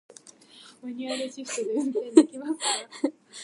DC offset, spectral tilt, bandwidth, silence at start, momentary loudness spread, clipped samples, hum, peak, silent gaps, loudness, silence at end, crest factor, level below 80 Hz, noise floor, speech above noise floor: under 0.1%; -2 dB/octave; 11.5 kHz; 0.25 s; 14 LU; under 0.1%; none; -2 dBFS; none; -26 LUFS; 0 s; 26 dB; -86 dBFS; -52 dBFS; 26 dB